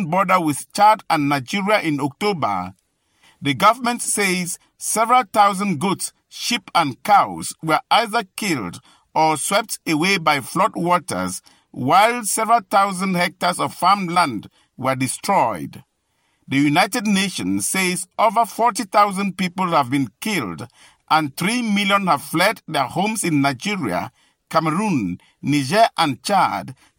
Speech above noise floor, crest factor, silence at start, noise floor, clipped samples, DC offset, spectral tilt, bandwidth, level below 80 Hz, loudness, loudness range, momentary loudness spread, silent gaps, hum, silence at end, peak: 48 dB; 16 dB; 0 s; -67 dBFS; under 0.1%; under 0.1%; -4 dB/octave; 17 kHz; -62 dBFS; -19 LUFS; 2 LU; 10 LU; none; none; 0.25 s; -4 dBFS